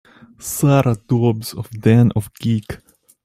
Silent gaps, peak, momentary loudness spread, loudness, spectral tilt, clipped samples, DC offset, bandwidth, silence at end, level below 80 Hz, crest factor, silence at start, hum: none; -2 dBFS; 16 LU; -17 LUFS; -7 dB/octave; under 0.1%; under 0.1%; 15.5 kHz; 0.5 s; -48 dBFS; 16 dB; 0.4 s; none